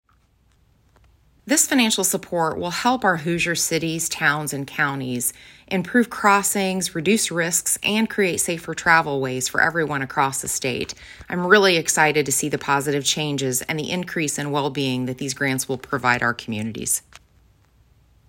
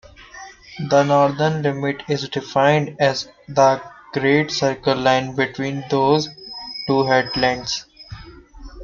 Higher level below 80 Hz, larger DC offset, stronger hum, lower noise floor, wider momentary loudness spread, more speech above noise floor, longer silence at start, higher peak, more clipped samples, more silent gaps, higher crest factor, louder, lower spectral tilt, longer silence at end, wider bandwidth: second, -56 dBFS vs -48 dBFS; neither; neither; first, -60 dBFS vs -40 dBFS; second, 8 LU vs 16 LU; first, 39 dB vs 22 dB; first, 1.45 s vs 0.2 s; about the same, 0 dBFS vs -2 dBFS; neither; neither; about the same, 22 dB vs 18 dB; about the same, -21 LUFS vs -19 LUFS; second, -3 dB/octave vs -5 dB/octave; first, 1.3 s vs 0 s; first, 16.5 kHz vs 7.4 kHz